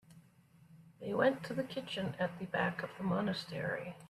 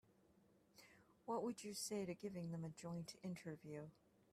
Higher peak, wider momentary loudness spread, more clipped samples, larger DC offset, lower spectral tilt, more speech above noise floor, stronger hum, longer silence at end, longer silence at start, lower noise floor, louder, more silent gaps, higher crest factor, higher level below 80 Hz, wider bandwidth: first, -18 dBFS vs -34 dBFS; second, 7 LU vs 19 LU; neither; neither; first, -6.5 dB/octave vs -5 dB/octave; about the same, 28 dB vs 26 dB; neither; second, 0.05 s vs 0.4 s; second, 0.1 s vs 0.75 s; second, -64 dBFS vs -75 dBFS; first, -37 LUFS vs -50 LUFS; neither; about the same, 20 dB vs 18 dB; first, -72 dBFS vs -84 dBFS; second, 13.5 kHz vs 15 kHz